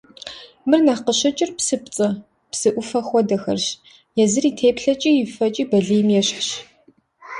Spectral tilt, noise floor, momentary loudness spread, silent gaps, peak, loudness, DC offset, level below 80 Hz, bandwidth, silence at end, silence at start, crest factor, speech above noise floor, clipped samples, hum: -4 dB/octave; -56 dBFS; 12 LU; none; -4 dBFS; -19 LUFS; under 0.1%; -60 dBFS; 11.5 kHz; 0 s; 0.25 s; 16 dB; 38 dB; under 0.1%; none